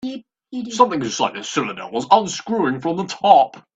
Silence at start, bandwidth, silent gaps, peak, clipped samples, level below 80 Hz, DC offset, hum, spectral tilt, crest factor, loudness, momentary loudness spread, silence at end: 0.05 s; 8 kHz; none; 0 dBFS; under 0.1%; -62 dBFS; under 0.1%; none; -4 dB/octave; 18 dB; -18 LUFS; 16 LU; 0.15 s